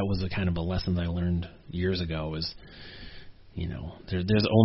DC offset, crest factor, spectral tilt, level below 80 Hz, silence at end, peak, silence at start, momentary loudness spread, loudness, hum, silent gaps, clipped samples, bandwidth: under 0.1%; 22 dB; -6 dB/octave; -42 dBFS; 0 s; -6 dBFS; 0 s; 18 LU; -30 LUFS; none; none; under 0.1%; 6 kHz